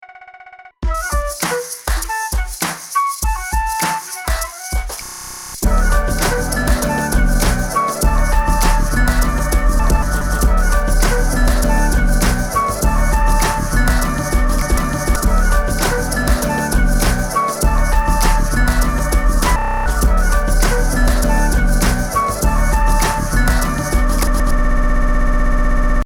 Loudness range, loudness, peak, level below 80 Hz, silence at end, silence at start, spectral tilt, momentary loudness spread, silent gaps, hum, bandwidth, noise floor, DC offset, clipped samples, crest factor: 4 LU; -17 LUFS; -2 dBFS; -16 dBFS; 0 s; 0 s; -4.5 dB/octave; 5 LU; none; none; 17 kHz; -40 dBFS; under 0.1%; under 0.1%; 14 dB